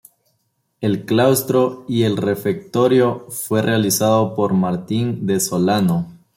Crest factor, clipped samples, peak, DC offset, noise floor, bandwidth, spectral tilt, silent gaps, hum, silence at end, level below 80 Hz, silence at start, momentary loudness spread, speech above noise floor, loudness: 16 dB; under 0.1%; -2 dBFS; under 0.1%; -68 dBFS; 16.5 kHz; -5.5 dB/octave; none; none; 0.25 s; -58 dBFS; 0.8 s; 7 LU; 51 dB; -18 LUFS